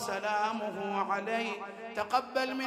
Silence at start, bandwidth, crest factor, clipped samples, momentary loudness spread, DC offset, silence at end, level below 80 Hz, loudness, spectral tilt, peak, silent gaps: 0 s; 16 kHz; 18 dB; under 0.1%; 7 LU; under 0.1%; 0 s; -74 dBFS; -33 LUFS; -3.5 dB/octave; -16 dBFS; none